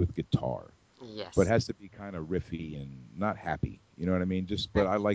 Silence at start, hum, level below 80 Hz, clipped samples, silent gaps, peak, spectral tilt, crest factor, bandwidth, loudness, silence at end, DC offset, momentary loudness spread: 0 s; none; -46 dBFS; under 0.1%; none; -10 dBFS; -6.5 dB/octave; 22 dB; 8 kHz; -32 LUFS; 0 s; under 0.1%; 15 LU